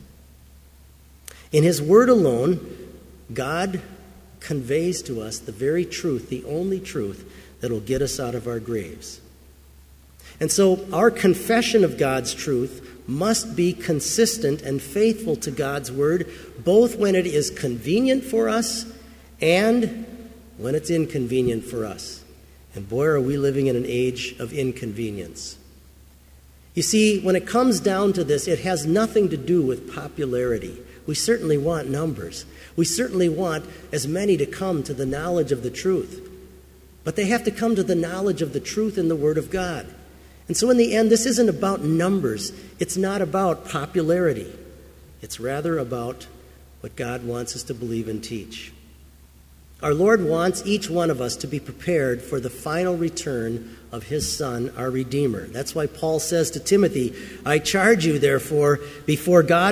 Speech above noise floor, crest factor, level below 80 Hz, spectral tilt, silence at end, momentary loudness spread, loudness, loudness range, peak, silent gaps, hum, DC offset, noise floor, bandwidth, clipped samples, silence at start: 28 dB; 20 dB; -48 dBFS; -5 dB/octave; 0 s; 15 LU; -22 LUFS; 7 LU; -2 dBFS; none; none; under 0.1%; -49 dBFS; 16 kHz; under 0.1%; 0 s